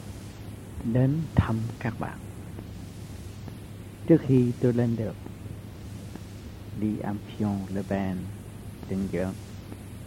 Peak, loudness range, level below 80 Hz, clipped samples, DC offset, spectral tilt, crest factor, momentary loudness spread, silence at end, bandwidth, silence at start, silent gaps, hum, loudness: -6 dBFS; 5 LU; -46 dBFS; under 0.1%; under 0.1%; -8 dB/octave; 22 dB; 18 LU; 0 s; 16 kHz; 0 s; none; none; -28 LUFS